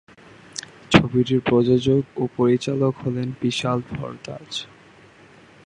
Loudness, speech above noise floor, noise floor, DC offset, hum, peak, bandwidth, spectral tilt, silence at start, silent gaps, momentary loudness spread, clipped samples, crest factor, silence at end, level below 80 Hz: -21 LUFS; 28 dB; -49 dBFS; under 0.1%; none; 0 dBFS; 11 kHz; -6 dB/octave; 0.55 s; none; 17 LU; under 0.1%; 22 dB; 1.05 s; -48 dBFS